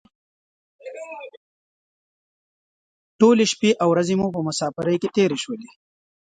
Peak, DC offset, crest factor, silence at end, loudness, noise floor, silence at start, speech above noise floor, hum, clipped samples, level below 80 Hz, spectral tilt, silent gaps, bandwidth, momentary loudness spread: -2 dBFS; under 0.1%; 20 dB; 0.55 s; -20 LUFS; under -90 dBFS; 0.85 s; over 70 dB; none; under 0.1%; -64 dBFS; -5 dB/octave; 1.37-3.19 s; 9.4 kHz; 20 LU